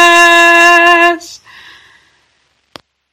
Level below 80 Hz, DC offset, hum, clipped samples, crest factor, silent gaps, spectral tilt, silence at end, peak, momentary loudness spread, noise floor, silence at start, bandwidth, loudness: -52 dBFS; under 0.1%; none; 2%; 10 dB; none; -0.5 dB/octave; 1.75 s; 0 dBFS; 7 LU; -58 dBFS; 0 s; over 20 kHz; -5 LUFS